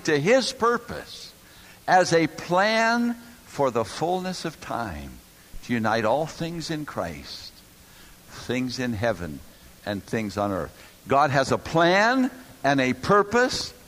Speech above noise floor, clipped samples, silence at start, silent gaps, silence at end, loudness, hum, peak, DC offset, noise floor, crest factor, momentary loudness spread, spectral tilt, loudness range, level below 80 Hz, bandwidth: 26 dB; under 0.1%; 0 s; none; 0.15 s; -24 LUFS; none; -6 dBFS; under 0.1%; -50 dBFS; 18 dB; 18 LU; -4.5 dB/octave; 8 LU; -52 dBFS; 15.5 kHz